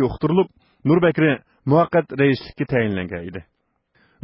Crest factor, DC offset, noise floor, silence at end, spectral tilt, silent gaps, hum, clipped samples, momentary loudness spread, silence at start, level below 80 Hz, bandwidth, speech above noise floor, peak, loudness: 16 dB; under 0.1%; -65 dBFS; 0.8 s; -12 dB/octave; none; none; under 0.1%; 12 LU; 0 s; -48 dBFS; 5.8 kHz; 46 dB; -4 dBFS; -20 LUFS